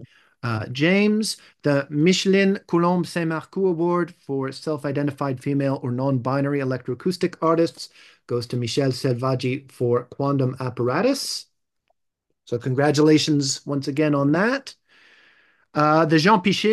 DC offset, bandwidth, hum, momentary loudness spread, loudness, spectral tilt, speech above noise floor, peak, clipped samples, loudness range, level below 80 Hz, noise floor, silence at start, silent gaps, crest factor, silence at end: under 0.1%; 12.5 kHz; none; 10 LU; -22 LUFS; -5.5 dB/octave; 56 dB; -4 dBFS; under 0.1%; 4 LU; -68 dBFS; -77 dBFS; 0 s; none; 18 dB; 0 s